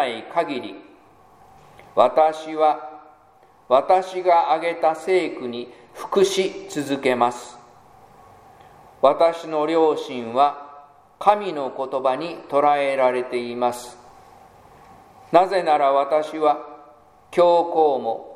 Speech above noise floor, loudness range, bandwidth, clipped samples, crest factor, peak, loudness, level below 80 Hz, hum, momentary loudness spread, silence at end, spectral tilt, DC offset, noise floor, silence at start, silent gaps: 34 dB; 3 LU; 15 kHz; under 0.1%; 20 dB; 0 dBFS; -21 LUFS; -66 dBFS; none; 13 LU; 0 s; -4.5 dB/octave; under 0.1%; -53 dBFS; 0 s; none